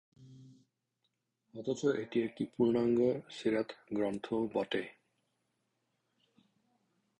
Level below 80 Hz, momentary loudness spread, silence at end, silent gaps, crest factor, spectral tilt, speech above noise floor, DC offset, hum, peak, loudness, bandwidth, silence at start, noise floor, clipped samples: -72 dBFS; 9 LU; 2.3 s; none; 20 dB; -6.5 dB/octave; 50 dB; under 0.1%; none; -18 dBFS; -34 LUFS; 10.5 kHz; 0.2 s; -83 dBFS; under 0.1%